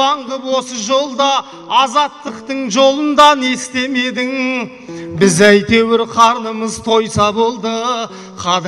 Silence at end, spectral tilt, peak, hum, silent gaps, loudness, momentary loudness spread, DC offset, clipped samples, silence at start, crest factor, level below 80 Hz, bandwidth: 0 s; -3.5 dB/octave; 0 dBFS; none; none; -14 LUFS; 12 LU; under 0.1%; under 0.1%; 0 s; 14 dB; -48 dBFS; 15 kHz